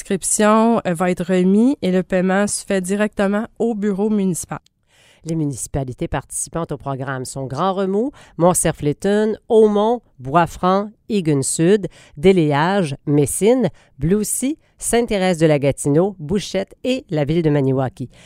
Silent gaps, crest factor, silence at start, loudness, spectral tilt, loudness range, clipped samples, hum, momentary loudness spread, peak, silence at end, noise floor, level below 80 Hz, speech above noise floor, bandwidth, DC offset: none; 16 dB; 0 s; -18 LUFS; -5.5 dB/octave; 6 LU; under 0.1%; none; 10 LU; -2 dBFS; 0.2 s; -54 dBFS; -44 dBFS; 36 dB; 16 kHz; under 0.1%